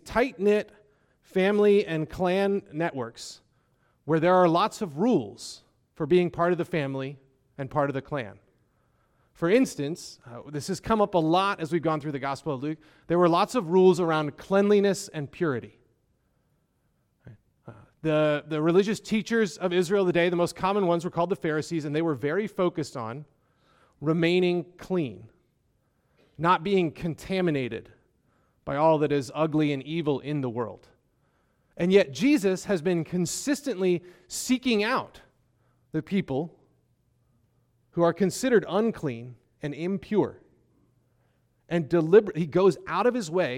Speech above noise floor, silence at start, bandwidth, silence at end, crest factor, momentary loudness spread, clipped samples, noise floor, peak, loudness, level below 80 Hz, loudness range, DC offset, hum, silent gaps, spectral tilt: 46 dB; 0.05 s; 15.5 kHz; 0 s; 20 dB; 14 LU; under 0.1%; -71 dBFS; -6 dBFS; -26 LUFS; -60 dBFS; 5 LU; under 0.1%; none; none; -6 dB/octave